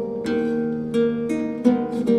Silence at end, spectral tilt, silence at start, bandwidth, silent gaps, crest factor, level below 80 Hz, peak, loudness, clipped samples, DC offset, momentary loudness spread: 0 s; -7.5 dB/octave; 0 s; 10.5 kHz; none; 18 dB; -56 dBFS; -4 dBFS; -22 LUFS; under 0.1%; under 0.1%; 4 LU